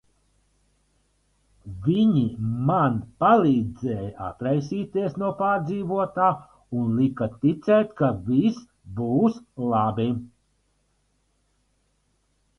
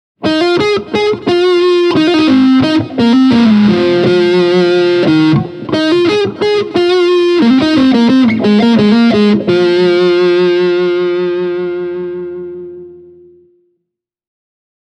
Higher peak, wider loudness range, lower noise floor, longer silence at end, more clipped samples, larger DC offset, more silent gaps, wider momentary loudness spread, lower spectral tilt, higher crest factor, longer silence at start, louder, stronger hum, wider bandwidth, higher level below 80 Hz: second, -6 dBFS vs 0 dBFS; second, 5 LU vs 8 LU; second, -69 dBFS vs -74 dBFS; first, 2.3 s vs 1.95 s; neither; neither; neither; first, 11 LU vs 8 LU; first, -9 dB/octave vs -6.5 dB/octave; first, 18 dB vs 10 dB; first, 1.65 s vs 0.2 s; second, -24 LUFS vs -10 LUFS; first, 50 Hz at -55 dBFS vs none; second, 6.6 kHz vs 8.6 kHz; about the same, -54 dBFS vs -50 dBFS